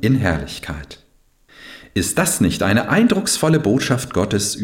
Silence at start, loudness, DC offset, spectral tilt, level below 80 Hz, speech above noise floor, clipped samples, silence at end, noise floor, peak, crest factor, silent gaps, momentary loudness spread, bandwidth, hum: 0 s; -18 LUFS; under 0.1%; -4.5 dB/octave; -40 dBFS; 37 dB; under 0.1%; 0 s; -54 dBFS; -4 dBFS; 14 dB; none; 16 LU; 17 kHz; none